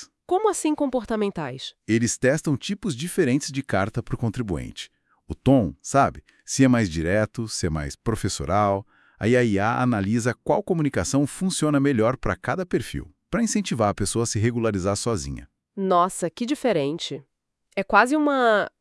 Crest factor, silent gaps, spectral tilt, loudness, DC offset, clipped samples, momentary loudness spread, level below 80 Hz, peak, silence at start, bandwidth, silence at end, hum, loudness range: 22 dB; none; -5.5 dB/octave; -23 LUFS; under 0.1%; under 0.1%; 11 LU; -46 dBFS; -2 dBFS; 0 s; 12 kHz; 0.15 s; none; 2 LU